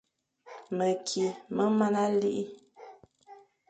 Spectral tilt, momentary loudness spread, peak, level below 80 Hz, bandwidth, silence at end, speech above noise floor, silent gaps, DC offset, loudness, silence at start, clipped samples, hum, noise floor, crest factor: -5.5 dB/octave; 21 LU; -14 dBFS; -76 dBFS; 9.2 kHz; 0.35 s; 27 dB; none; under 0.1%; -29 LUFS; 0.45 s; under 0.1%; none; -55 dBFS; 18 dB